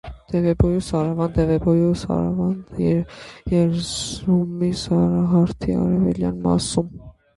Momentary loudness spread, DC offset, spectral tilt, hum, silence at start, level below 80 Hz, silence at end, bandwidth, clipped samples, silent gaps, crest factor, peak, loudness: 6 LU; under 0.1%; -7 dB/octave; none; 0.05 s; -36 dBFS; 0.25 s; 11.5 kHz; under 0.1%; none; 16 dB; -4 dBFS; -21 LUFS